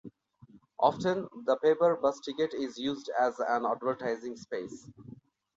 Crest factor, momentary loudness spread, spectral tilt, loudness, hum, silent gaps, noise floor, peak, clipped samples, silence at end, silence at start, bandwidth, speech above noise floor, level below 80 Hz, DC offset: 20 dB; 13 LU; -5.5 dB/octave; -31 LUFS; none; none; -59 dBFS; -10 dBFS; under 0.1%; 0.45 s; 0.05 s; 7.8 kHz; 28 dB; -72 dBFS; under 0.1%